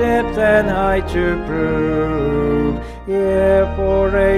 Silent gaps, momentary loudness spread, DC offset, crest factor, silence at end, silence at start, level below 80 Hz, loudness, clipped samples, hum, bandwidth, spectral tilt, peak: none; 5 LU; under 0.1%; 14 dB; 0 s; 0 s; -28 dBFS; -17 LUFS; under 0.1%; none; 13 kHz; -7.5 dB/octave; -2 dBFS